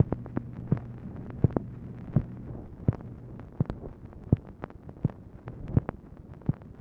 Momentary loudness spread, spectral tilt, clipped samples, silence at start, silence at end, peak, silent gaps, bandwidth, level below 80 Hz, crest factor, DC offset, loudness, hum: 16 LU; -11.5 dB/octave; under 0.1%; 0 s; 0 s; -8 dBFS; none; 3.8 kHz; -44 dBFS; 24 dB; under 0.1%; -33 LUFS; none